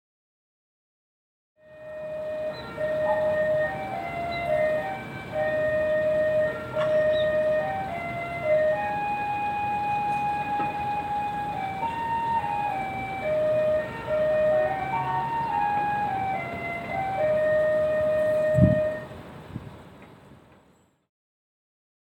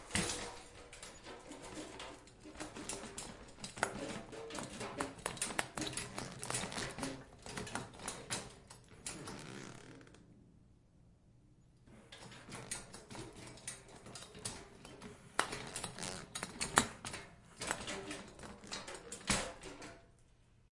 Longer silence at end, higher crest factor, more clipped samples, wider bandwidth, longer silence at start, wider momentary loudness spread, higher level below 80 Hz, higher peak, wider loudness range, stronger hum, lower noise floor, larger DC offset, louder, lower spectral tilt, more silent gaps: first, 1.8 s vs 0.15 s; second, 20 dB vs 40 dB; neither; first, 16 kHz vs 11.5 kHz; first, 1.7 s vs 0 s; second, 10 LU vs 17 LU; first, -52 dBFS vs -62 dBFS; about the same, -6 dBFS vs -6 dBFS; second, 4 LU vs 12 LU; neither; second, -61 dBFS vs -66 dBFS; neither; first, -26 LUFS vs -43 LUFS; first, -7 dB/octave vs -2.5 dB/octave; neither